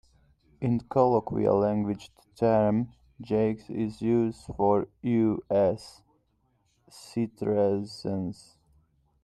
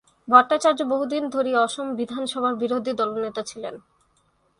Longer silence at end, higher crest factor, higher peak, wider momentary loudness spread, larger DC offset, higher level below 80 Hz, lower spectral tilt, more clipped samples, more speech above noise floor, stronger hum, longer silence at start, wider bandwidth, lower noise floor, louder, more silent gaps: about the same, 0.9 s vs 0.8 s; about the same, 20 dB vs 22 dB; second, -8 dBFS vs 0 dBFS; second, 10 LU vs 14 LU; neither; first, -58 dBFS vs -68 dBFS; first, -8.5 dB/octave vs -3.5 dB/octave; neither; about the same, 44 dB vs 43 dB; neither; first, 0.6 s vs 0.25 s; about the same, 12 kHz vs 11.5 kHz; first, -71 dBFS vs -65 dBFS; second, -27 LUFS vs -22 LUFS; neither